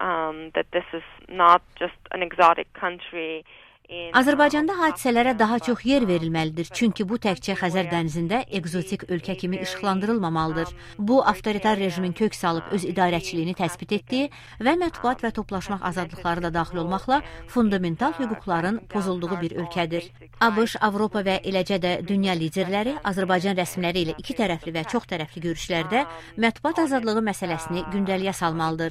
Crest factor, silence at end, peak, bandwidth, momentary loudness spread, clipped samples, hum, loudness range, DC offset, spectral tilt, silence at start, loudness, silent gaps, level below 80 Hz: 22 dB; 0 s; -2 dBFS; 15.5 kHz; 9 LU; under 0.1%; none; 4 LU; under 0.1%; -5.5 dB/octave; 0 s; -24 LUFS; none; -50 dBFS